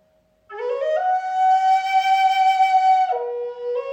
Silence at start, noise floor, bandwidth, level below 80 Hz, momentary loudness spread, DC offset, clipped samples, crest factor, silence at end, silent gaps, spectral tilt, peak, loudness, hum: 0.5 s; -60 dBFS; 8.2 kHz; -72 dBFS; 11 LU; under 0.1%; under 0.1%; 10 dB; 0 s; none; 0.5 dB/octave; -8 dBFS; -19 LUFS; none